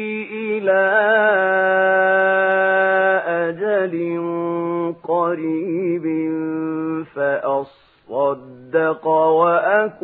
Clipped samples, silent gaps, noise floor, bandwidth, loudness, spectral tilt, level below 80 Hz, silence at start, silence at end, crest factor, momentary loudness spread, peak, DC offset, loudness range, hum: under 0.1%; none; -40 dBFS; 4.1 kHz; -18 LUFS; -9.5 dB/octave; -72 dBFS; 0 s; 0.1 s; 16 dB; 9 LU; -2 dBFS; under 0.1%; 6 LU; none